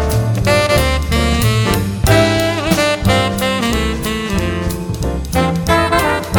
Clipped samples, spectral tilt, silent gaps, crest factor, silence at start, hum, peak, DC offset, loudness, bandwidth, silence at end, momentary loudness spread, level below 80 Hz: under 0.1%; -5 dB/octave; none; 14 dB; 0 s; none; 0 dBFS; under 0.1%; -15 LUFS; over 20 kHz; 0 s; 7 LU; -24 dBFS